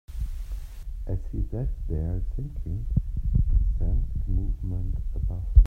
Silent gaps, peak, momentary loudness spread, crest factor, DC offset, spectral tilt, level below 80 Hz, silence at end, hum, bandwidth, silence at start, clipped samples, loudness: none; -4 dBFS; 10 LU; 20 dB; under 0.1%; -10 dB/octave; -26 dBFS; 0 s; none; 1.8 kHz; 0.1 s; under 0.1%; -30 LUFS